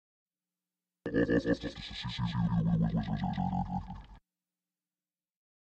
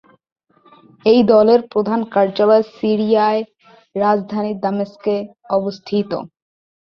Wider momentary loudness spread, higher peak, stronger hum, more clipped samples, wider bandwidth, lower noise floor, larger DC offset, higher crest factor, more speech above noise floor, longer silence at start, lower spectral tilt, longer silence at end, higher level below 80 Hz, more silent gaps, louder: about the same, 11 LU vs 11 LU; second, -16 dBFS vs -2 dBFS; neither; neither; first, 8 kHz vs 6.2 kHz; first, under -90 dBFS vs -50 dBFS; neither; about the same, 20 dB vs 16 dB; first, over 58 dB vs 34 dB; about the same, 1.05 s vs 1.05 s; about the same, -8 dB/octave vs -8 dB/octave; first, 1.5 s vs 0.55 s; first, -50 dBFS vs -60 dBFS; neither; second, -33 LUFS vs -17 LUFS